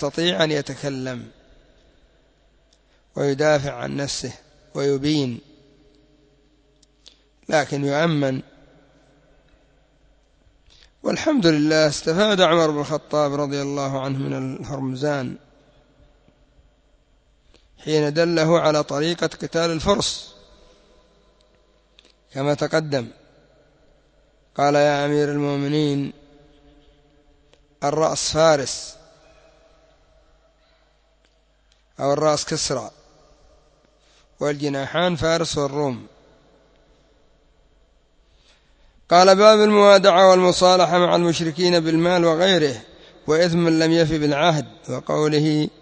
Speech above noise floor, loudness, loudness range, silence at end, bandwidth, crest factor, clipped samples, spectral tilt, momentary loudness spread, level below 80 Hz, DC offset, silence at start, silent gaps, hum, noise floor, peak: 42 dB; -19 LUFS; 13 LU; 0.15 s; 8 kHz; 22 dB; under 0.1%; -5 dB/octave; 14 LU; -52 dBFS; under 0.1%; 0 s; none; none; -60 dBFS; 0 dBFS